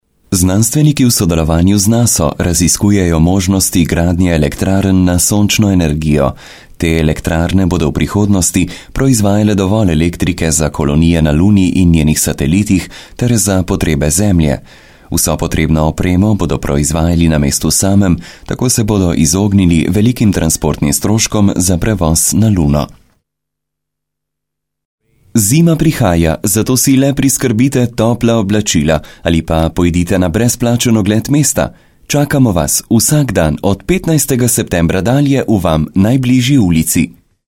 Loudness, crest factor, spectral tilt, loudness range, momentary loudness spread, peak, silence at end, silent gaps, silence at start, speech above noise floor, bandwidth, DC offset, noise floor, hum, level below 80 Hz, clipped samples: -11 LUFS; 12 dB; -5 dB/octave; 2 LU; 5 LU; 0 dBFS; 0.4 s; 24.85-24.98 s; 0.3 s; 67 dB; 17 kHz; under 0.1%; -78 dBFS; none; -26 dBFS; under 0.1%